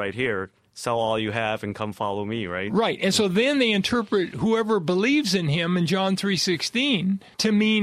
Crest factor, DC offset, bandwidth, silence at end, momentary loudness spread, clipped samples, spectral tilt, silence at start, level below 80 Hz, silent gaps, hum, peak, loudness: 16 dB; under 0.1%; 14.5 kHz; 0 s; 8 LU; under 0.1%; -4.5 dB/octave; 0 s; -58 dBFS; none; none; -8 dBFS; -23 LUFS